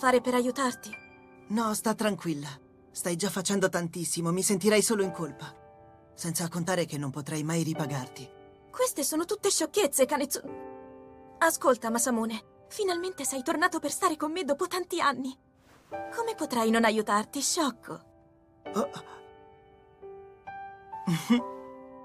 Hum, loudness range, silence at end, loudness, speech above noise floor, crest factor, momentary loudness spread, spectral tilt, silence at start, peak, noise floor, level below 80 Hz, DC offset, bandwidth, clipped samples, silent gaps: none; 5 LU; 0 s; -29 LUFS; 31 dB; 20 dB; 20 LU; -3.5 dB/octave; 0 s; -10 dBFS; -60 dBFS; -68 dBFS; under 0.1%; 15.5 kHz; under 0.1%; none